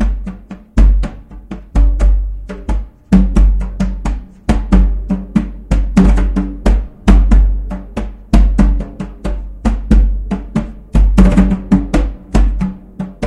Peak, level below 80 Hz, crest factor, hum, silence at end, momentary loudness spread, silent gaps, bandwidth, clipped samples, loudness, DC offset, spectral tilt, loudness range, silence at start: 0 dBFS; -14 dBFS; 12 dB; none; 0 s; 14 LU; none; 8.6 kHz; 0.2%; -15 LUFS; under 0.1%; -8 dB/octave; 2 LU; 0 s